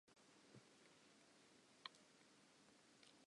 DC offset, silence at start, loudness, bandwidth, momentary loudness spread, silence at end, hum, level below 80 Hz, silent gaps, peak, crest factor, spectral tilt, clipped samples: under 0.1%; 0.05 s; -65 LUFS; 11 kHz; 10 LU; 0 s; none; under -90 dBFS; none; -32 dBFS; 36 dB; -2.5 dB/octave; under 0.1%